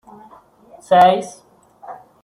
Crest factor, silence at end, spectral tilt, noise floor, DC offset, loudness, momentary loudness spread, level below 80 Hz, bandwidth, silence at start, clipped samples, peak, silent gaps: 18 dB; 0.3 s; -5 dB/octave; -47 dBFS; under 0.1%; -14 LUFS; 26 LU; -62 dBFS; 12.5 kHz; 0.9 s; under 0.1%; -2 dBFS; none